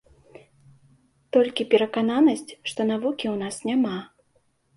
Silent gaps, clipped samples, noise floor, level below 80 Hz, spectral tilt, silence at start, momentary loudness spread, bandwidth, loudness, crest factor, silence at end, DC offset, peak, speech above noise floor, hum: none; under 0.1%; -66 dBFS; -68 dBFS; -5 dB/octave; 1.35 s; 9 LU; 11.5 kHz; -24 LUFS; 20 dB; 0.7 s; under 0.1%; -6 dBFS; 44 dB; none